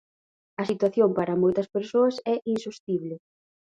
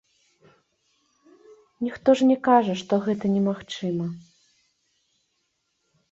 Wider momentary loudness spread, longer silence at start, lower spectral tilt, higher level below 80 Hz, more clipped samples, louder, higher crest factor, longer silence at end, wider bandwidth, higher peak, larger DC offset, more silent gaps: second, 10 LU vs 13 LU; second, 0.6 s vs 1.8 s; about the same, -7 dB/octave vs -6.5 dB/octave; about the same, -68 dBFS vs -66 dBFS; neither; about the same, -25 LUFS vs -23 LUFS; about the same, 16 dB vs 20 dB; second, 0.65 s vs 1.9 s; first, 9.2 kHz vs 8 kHz; second, -10 dBFS vs -6 dBFS; neither; first, 2.80-2.87 s vs none